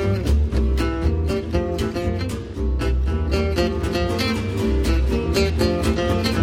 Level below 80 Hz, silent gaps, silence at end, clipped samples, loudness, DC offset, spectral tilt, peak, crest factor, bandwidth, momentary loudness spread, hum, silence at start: -24 dBFS; none; 0 s; under 0.1%; -22 LUFS; under 0.1%; -6.5 dB/octave; -6 dBFS; 14 dB; 15 kHz; 4 LU; none; 0 s